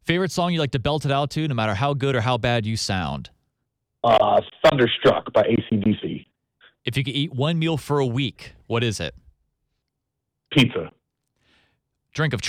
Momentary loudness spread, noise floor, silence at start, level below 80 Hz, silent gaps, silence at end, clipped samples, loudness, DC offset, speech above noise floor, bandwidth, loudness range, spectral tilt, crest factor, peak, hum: 12 LU; -80 dBFS; 0.05 s; -50 dBFS; none; 0 s; under 0.1%; -22 LUFS; under 0.1%; 59 dB; 15 kHz; 6 LU; -5.5 dB/octave; 18 dB; -6 dBFS; none